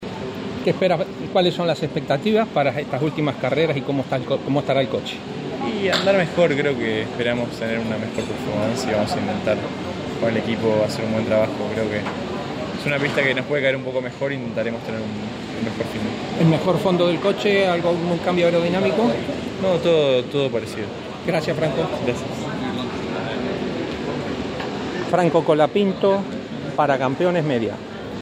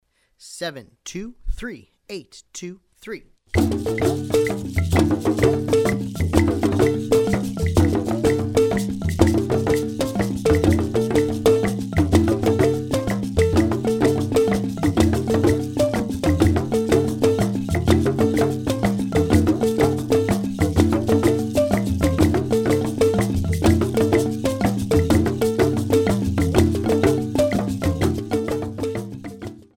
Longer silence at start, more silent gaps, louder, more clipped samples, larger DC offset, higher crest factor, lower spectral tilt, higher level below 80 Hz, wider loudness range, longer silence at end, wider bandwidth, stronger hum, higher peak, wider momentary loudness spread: second, 0 s vs 0.45 s; neither; about the same, -22 LUFS vs -20 LUFS; neither; neither; about the same, 18 dB vs 20 dB; about the same, -6 dB/octave vs -6.5 dB/octave; second, -50 dBFS vs -34 dBFS; about the same, 4 LU vs 3 LU; second, 0 s vs 0.2 s; about the same, 15.5 kHz vs 17 kHz; neither; second, -4 dBFS vs 0 dBFS; second, 9 LU vs 13 LU